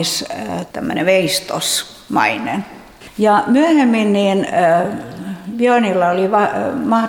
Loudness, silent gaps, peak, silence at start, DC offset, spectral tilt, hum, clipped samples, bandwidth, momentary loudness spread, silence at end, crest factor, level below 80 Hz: -16 LUFS; none; 0 dBFS; 0 s; under 0.1%; -4 dB/octave; none; under 0.1%; 20 kHz; 12 LU; 0 s; 14 dB; -54 dBFS